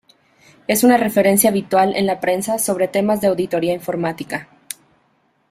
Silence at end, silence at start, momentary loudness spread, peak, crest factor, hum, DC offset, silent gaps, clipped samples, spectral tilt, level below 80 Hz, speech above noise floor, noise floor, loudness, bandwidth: 1.05 s; 0.7 s; 17 LU; 0 dBFS; 18 dB; none; under 0.1%; none; under 0.1%; -4.5 dB/octave; -58 dBFS; 45 dB; -62 dBFS; -17 LUFS; 16 kHz